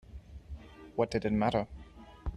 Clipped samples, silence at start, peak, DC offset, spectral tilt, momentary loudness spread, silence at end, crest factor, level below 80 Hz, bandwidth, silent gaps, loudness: under 0.1%; 0.1 s; -14 dBFS; under 0.1%; -7.5 dB/octave; 21 LU; 0 s; 20 dB; -48 dBFS; 10.5 kHz; none; -33 LUFS